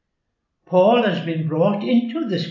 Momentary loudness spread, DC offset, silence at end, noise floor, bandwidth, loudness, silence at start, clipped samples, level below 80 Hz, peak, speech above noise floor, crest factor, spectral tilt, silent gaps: 8 LU; under 0.1%; 0 s; -75 dBFS; 7 kHz; -19 LUFS; 0.7 s; under 0.1%; -76 dBFS; -4 dBFS; 57 dB; 14 dB; -8 dB/octave; none